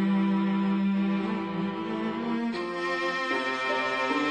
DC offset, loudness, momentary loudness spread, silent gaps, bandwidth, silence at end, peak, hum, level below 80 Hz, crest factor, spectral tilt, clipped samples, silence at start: under 0.1%; -28 LUFS; 5 LU; none; 9.2 kHz; 0 s; -14 dBFS; none; -74 dBFS; 12 dB; -6.5 dB/octave; under 0.1%; 0 s